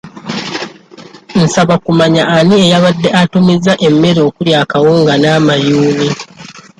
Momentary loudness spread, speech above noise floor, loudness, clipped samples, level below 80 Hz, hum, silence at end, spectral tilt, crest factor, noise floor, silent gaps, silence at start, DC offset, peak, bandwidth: 12 LU; 26 dB; -10 LUFS; under 0.1%; -46 dBFS; none; 0.2 s; -5.5 dB/octave; 10 dB; -35 dBFS; none; 0.05 s; under 0.1%; 0 dBFS; 11 kHz